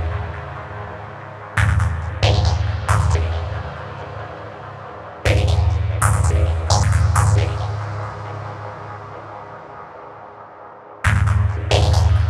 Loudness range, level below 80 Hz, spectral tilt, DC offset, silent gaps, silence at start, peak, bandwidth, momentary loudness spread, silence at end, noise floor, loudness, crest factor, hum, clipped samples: 8 LU; -26 dBFS; -5 dB/octave; under 0.1%; none; 0 s; 0 dBFS; 12.5 kHz; 19 LU; 0 s; -39 dBFS; -19 LUFS; 18 dB; none; under 0.1%